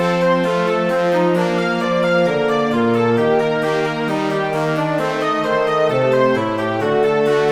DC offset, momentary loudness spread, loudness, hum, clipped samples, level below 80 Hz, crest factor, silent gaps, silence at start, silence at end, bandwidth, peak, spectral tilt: 0.2%; 4 LU; -17 LUFS; none; under 0.1%; -54 dBFS; 14 dB; none; 0 s; 0 s; 14 kHz; -2 dBFS; -6.5 dB/octave